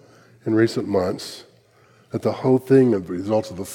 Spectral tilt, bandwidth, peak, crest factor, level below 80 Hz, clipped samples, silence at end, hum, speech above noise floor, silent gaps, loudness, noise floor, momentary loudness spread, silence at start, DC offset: -7 dB/octave; 16 kHz; -4 dBFS; 16 dB; -62 dBFS; under 0.1%; 0 s; none; 35 dB; none; -21 LUFS; -55 dBFS; 16 LU; 0.45 s; under 0.1%